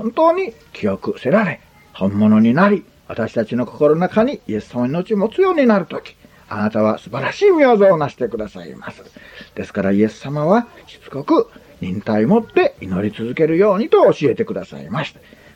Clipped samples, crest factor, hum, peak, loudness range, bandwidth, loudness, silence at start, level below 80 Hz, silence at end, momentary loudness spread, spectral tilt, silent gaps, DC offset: under 0.1%; 16 dB; none; -2 dBFS; 4 LU; 8.2 kHz; -17 LUFS; 0 s; -54 dBFS; 0.45 s; 17 LU; -8 dB/octave; none; under 0.1%